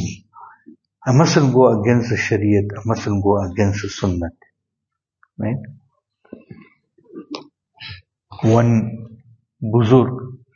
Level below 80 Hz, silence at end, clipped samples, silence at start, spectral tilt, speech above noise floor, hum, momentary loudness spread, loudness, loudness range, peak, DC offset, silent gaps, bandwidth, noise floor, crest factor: -48 dBFS; 0.2 s; under 0.1%; 0 s; -7 dB/octave; 65 dB; none; 20 LU; -18 LUFS; 16 LU; 0 dBFS; under 0.1%; none; 7.2 kHz; -81 dBFS; 20 dB